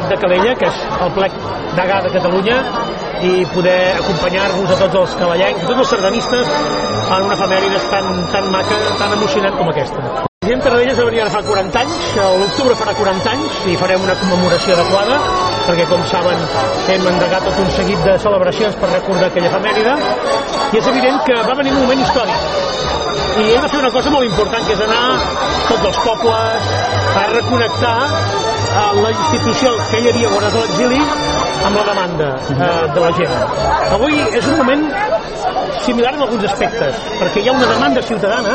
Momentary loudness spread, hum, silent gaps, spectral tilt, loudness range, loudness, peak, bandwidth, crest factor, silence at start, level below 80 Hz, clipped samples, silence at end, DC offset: 4 LU; none; 10.28-10.41 s; -4.5 dB/octave; 1 LU; -14 LUFS; 0 dBFS; 8.8 kHz; 14 dB; 0 s; -36 dBFS; under 0.1%; 0 s; under 0.1%